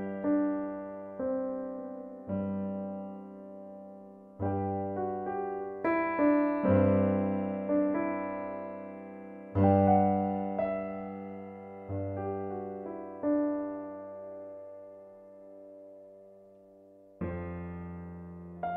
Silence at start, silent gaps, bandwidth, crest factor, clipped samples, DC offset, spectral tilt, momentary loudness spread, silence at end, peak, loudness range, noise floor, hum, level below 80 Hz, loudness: 0 s; none; 4.3 kHz; 20 dB; under 0.1%; under 0.1%; -12 dB/octave; 21 LU; 0 s; -12 dBFS; 15 LU; -56 dBFS; none; -62 dBFS; -32 LUFS